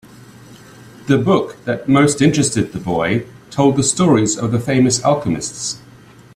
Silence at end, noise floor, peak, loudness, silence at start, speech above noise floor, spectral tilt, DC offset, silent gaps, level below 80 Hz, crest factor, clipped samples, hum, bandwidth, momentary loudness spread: 0.6 s; -43 dBFS; 0 dBFS; -16 LUFS; 0.5 s; 27 dB; -5 dB/octave; under 0.1%; none; -48 dBFS; 16 dB; under 0.1%; none; 14 kHz; 9 LU